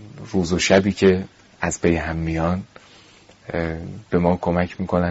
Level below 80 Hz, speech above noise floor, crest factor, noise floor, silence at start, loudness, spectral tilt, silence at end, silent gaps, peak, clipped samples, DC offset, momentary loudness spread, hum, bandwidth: -40 dBFS; 29 dB; 20 dB; -49 dBFS; 0 s; -21 LUFS; -5.5 dB/octave; 0 s; none; -2 dBFS; under 0.1%; under 0.1%; 13 LU; none; 8 kHz